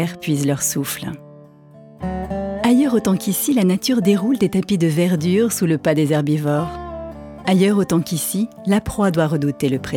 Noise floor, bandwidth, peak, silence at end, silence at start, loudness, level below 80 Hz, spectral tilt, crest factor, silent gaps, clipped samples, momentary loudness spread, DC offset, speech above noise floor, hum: -44 dBFS; 18.5 kHz; -4 dBFS; 0 s; 0 s; -18 LUFS; -46 dBFS; -5.5 dB/octave; 16 dB; none; under 0.1%; 11 LU; under 0.1%; 26 dB; none